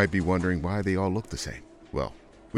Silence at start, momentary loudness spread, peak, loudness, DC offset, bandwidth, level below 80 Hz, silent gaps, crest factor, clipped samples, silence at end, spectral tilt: 0 s; 11 LU; -8 dBFS; -29 LUFS; under 0.1%; 13 kHz; -44 dBFS; none; 20 dB; under 0.1%; 0 s; -6.5 dB/octave